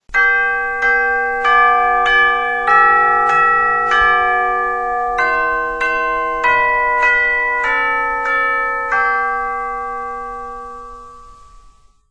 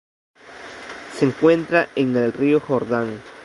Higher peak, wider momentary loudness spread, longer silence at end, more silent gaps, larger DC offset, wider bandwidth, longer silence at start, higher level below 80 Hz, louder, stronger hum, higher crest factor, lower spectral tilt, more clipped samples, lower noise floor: first, 0 dBFS vs -4 dBFS; second, 12 LU vs 18 LU; first, 0.75 s vs 0 s; neither; first, 0.4% vs under 0.1%; about the same, 10.5 kHz vs 11.5 kHz; second, 0.1 s vs 0.45 s; first, -42 dBFS vs -60 dBFS; first, -14 LUFS vs -19 LUFS; neither; about the same, 16 dB vs 18 dB; second, -3 dB/octave vs -7 dB/octave; neither; first, -47 dBFS vs -39 dBFS